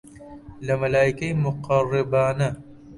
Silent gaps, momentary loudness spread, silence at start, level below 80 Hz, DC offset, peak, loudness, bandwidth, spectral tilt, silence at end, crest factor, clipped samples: none; 17 LU; 0.05 s; -50 dBFS; under 0.1%; -6 dBFS; -23 LUFS; 11.5 kHz; -7 dB/octave; 0 s; 18 dB; under 0.1%